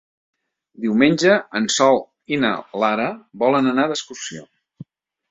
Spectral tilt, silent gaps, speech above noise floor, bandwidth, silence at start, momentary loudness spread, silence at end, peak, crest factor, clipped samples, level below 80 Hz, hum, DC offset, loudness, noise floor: -4 dB/octave; none; 24 dB; 8.2 kHz; 0.8 s; 12 LU; 0.45 s; 0 dBFS; 20 dB; under 0.1%; -64 dBFS; none; under 0.1%; -19 LUFS; -43 dBFS